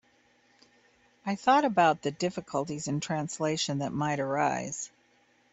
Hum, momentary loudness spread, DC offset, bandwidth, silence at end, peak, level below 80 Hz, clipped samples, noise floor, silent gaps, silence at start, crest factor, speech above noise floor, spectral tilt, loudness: none; 12 LU; under 0.1%; 8.4 kHz; 0.65 s; -10 dBFS; -70 dBFS; under 0.1%; -66 dBFS; none; 1.25 s; 20 dB; 37 dB; -4.5 dB/octave; -29 LUFS